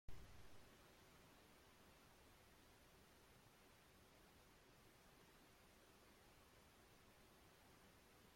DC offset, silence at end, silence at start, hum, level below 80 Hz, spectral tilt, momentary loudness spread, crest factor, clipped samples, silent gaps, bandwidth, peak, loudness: under 0.1%; 0 s; 0.1 s; none; -74 dBFS; -3.5 dB/octave; 2 LU; 22 dB; under 0.1%; none; 16.5 kHz; -42 dBFS; -69 LUFS